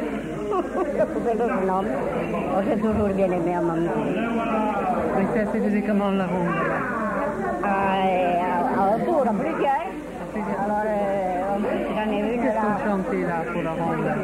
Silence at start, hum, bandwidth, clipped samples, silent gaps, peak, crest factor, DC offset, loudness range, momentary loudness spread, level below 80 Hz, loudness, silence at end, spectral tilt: 0 s; none; 13.5 kHz; under 0.1%; none; -10 dBFS; 14 dB; under 0.1%; 2 LU; 4 LU; -46 dBFS; -24 LUFS; 0 s; -7.5 dB/octave